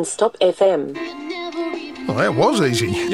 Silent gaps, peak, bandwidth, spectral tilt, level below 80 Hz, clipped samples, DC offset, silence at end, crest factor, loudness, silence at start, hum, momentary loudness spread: none; -6 dBFS; 15.5 kHz; -5 dB/octave; -56 dBFS; under 0.1%; 0.2%; 0 s; 14 dB; -20 LUFS; 0 s; none; 12 LU